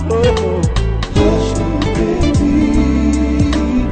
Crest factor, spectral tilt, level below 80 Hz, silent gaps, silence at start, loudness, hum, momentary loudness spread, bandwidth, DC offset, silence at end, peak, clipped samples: 12 dB; -7 dB/octave; -20 dBFS; none; 0 s; -15 LUFS; none; 4 LU; 9.2 kHz; under 0.1%; 0 s; -2 dBFS; under 0.1%